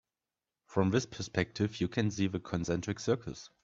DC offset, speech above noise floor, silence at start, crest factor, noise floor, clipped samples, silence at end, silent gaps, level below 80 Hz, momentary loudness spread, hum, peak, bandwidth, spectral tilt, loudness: under 0.1%; over 57 dB; 0.7 s; 22 dB; under -90 dBFS; under 0.1%; 0.15 s; none; -62 dBFS; 6 LU; none; -12 dBFS; 7.8 kHz; -6 dB/octave; -33 LUFS